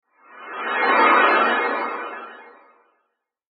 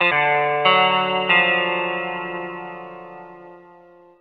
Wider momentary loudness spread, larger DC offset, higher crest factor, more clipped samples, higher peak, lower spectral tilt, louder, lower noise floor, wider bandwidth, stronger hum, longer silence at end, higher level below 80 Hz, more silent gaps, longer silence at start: about the same, 21 LU vs 22 LU; neither; about the same, 20 dB vs 20 dB; neither; about the same, -2 dBFS vs -2 dBFS; about the same, -6.5 dB/octave vs -6.5 dB/octave; about the same, -18 LUFS vs -18 LUFS; first, -74 dBFS vs -48 dBFS; about the same, 5.2 kHz vs 5.2 kHz; neither; first, 1.05 s vs 0.6 s; second, -86 dBFS vs -68 dBFS; neither; first, 0.35 s vs 0 s